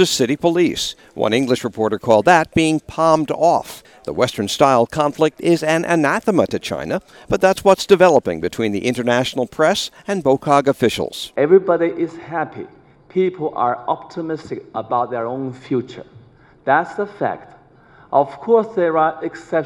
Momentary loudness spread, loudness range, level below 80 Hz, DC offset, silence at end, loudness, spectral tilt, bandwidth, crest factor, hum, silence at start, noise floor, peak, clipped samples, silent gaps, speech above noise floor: 12 LU; 7 LU; -52 dBFS; under 0.1%; 0 s; -18 LUFS; -5 dB/octave; 17 kHz; 18 dB; none; 0 s; -48 dBFS; 0 dBFS; under 0.1%; none; 31 dB